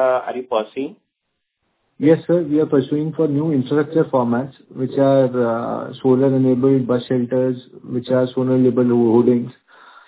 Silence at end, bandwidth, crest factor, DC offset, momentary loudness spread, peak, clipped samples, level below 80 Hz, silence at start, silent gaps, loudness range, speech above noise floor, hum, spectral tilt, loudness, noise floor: 0.55 s; 4 kHz; 16 dB; under 0.1%; 11 LU; -2 dBFS; under 0.1%; -62 dBFS; 0 s; none; 3 LU; 58 dB; none; -12.5 dB/octave; -18 LUFS; -75 dBFS